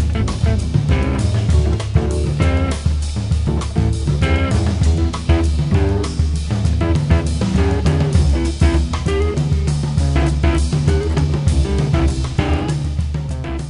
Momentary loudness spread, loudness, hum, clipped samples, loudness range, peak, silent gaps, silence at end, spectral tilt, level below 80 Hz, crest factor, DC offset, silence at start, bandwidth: 3 LU; -18 LUFS; none; under 0.1%; 1 LU; -2 dBFS; none; 0 s; -6.5 dB/octave; -20 dBFS; 14 dB; under 0.1%; 0 s; 11 kHz